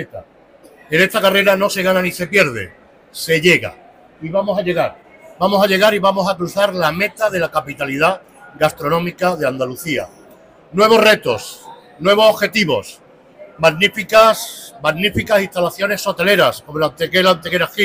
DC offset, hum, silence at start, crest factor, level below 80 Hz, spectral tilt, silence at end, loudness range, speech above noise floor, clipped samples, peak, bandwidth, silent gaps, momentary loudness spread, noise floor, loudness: under 0.1%; none; 0 s; 14 dB; -50 dBFS; -4 dB/octave; 0 s; 3 LU; 30 dB; under 0.1%; -2 dBFS; 16 kHz; none; 11 LU; -45 dBFS; -15 LUFS